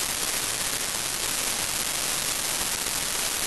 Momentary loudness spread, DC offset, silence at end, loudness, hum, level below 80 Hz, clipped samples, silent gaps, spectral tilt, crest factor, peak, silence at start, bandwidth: 1 LU; 0.4%; 0 s; -25 LUFS; none; -50 dBFS; under 0.1%; none; 0 dB/octave; 18 dB; -10 dBFS; 0 s; 13 kHz